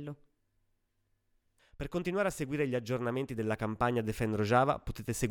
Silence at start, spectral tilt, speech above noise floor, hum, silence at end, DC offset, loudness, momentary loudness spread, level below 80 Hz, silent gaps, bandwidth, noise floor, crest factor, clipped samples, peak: 0 s; -6 dB/octave; 45 dB; none; 0 s; under 0.1%; -33 LUFS; 10 LU; -52 dBFS; none; 19 kHz; -77 dBFS; 20 dB; under 0.1%; -12 dBFS